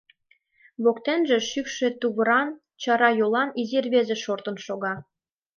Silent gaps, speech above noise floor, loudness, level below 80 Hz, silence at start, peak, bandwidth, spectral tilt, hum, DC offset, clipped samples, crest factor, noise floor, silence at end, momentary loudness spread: none; 41 dB; -24 LUFS; -74 dBFS; 0.8 s; -6 dBFS; 7.2 kHz; -4 dB/octave; none; under 0.1%; under 0.1%; 18 dB; -65 dBFS; 0.55 s; 11 LU